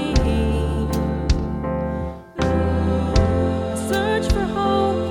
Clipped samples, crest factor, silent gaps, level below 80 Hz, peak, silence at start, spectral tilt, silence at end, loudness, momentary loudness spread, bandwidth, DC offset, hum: under 0.1%; 16 dB; none; -26 dBFS; -4 dBFS; 0 s; -6.5 dB/octave; 0 s; -21 LUFS; 6 LU; 16 kHz; under 0.1%; none